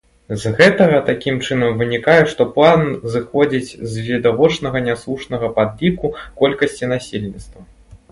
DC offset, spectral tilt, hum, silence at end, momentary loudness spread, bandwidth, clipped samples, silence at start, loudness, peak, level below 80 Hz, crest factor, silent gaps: under 0.1%; -6 dB/octave; none; 0.15 s; 12 LU; 11.5 kHz; under 0.1%; 0.3 s; -16 LUFS; 0 dBFS; -44 dBFS; 16 dB; none